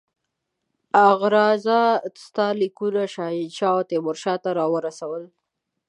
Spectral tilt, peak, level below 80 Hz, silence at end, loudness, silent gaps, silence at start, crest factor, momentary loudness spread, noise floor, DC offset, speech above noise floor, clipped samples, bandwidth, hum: -5.5 dB/octave; -4 dBFS; -80 dBFS; 0.6 s; -21 LUFS; none; 0.95 s; 18 dB; 12 LU; -79 dBFS; under 0.1%; 58 dB; under 0.1%; 11 kHz; none